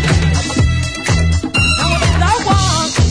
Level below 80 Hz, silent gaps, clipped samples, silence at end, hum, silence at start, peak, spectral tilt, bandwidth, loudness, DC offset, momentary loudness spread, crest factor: -20 dBFS; none; under 0.1%; 0 s; none; 0 s; -2 dBFS; -4.5 dB/octave; 10.5 kHz; -14 LUFS; under 0.1%; 3 LU; 12 dB